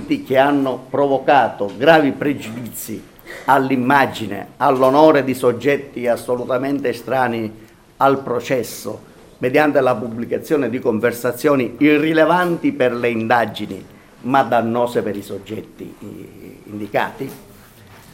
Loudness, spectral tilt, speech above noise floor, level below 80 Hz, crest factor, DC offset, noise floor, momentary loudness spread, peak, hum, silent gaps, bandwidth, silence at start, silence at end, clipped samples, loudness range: -17 LUFS; -5.5 dB/octave; 26 dB; -54 dBFS; 18 dB; under 0.1%; -43 dBFS; 17 LU; 0 dBFS; none; none; 16.5 kHz; 0 s; 0.2 s; under 0.1%; 5 LU